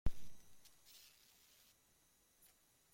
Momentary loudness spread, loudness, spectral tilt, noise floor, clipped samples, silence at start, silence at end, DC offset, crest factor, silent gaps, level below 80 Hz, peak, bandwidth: 7 LU; -61 LUFS; -5 dB/octave; -75 dBFS; under 0.1%; 0.05 s; 2.35 s; under 0.1%; 22 dB; none; -56 dBFS; -22 dBFS; 16.5 kHz